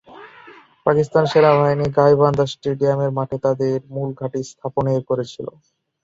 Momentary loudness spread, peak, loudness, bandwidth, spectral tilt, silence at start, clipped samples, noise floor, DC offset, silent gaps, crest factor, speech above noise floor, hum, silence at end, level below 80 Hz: 13 LU; 0 dBFS; -19 LUFS; 7.8 kHz; -7 dB/octave; 0.1 s; under 0.1%; -45 dBFS; under 0.1%; none; 18 dB; 27 dB; none; 0.55 s; -52 dBFS